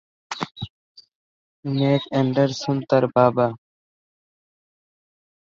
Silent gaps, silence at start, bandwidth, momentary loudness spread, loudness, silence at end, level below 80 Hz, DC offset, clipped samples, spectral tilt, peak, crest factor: 0.70-0.95 s, 1.15-1.63 s; 0.3 s; 7.6 kHz; 17 LU; -21 LUFS; 2 s; -62 dBFS; under 0.1%; under 0.1%; -7 dB/octave; -4 dBFS; 20 dB